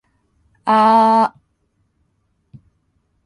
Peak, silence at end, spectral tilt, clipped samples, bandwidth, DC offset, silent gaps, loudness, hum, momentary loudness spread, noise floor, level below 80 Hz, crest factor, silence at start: -4 dBFS; 2 s; -6 dB/octave; under 0.1%; 11 kHz; under 0.1%; none; -14 LUFS; none; 10 LU; -66 dBFS; -64 dBFS; 16 dB; 0.65 s